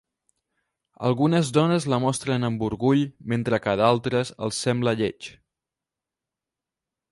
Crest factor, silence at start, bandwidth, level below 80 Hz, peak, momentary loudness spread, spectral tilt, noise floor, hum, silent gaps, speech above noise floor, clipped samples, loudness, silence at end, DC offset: 20 dB; 1 s; 11.5 kHz; -58 dBFS; -4 dBFS; 7 LU; -6 dB/octave; -88 dBFS; none; none; 65 dB; under 0.1%; -23 LUFS; 1.8 s; under 0.1%